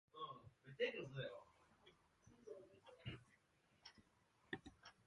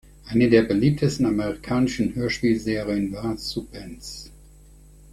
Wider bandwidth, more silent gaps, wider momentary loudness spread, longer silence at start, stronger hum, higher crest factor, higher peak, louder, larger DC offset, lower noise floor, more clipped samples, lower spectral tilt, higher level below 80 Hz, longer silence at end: second, 11 kHz vs 14.5 kHz; neither; about the same, 19 LU vs 19 LU; about the same, 0.15 s vs 0.25 s; neither; first, 26 dB vs 20 dB; second, -30 dBFS vs -2 dBFS; second, -52 LUFS vs -23 LUFS; neither; first, -79 dBFS vs -48 dBFS; neither; about the same, -5.5 dB/octave vs -6.5 dB/octave; second, -78 dBFS vs -46 dBFS; second, 0.05 s vs 0.75 s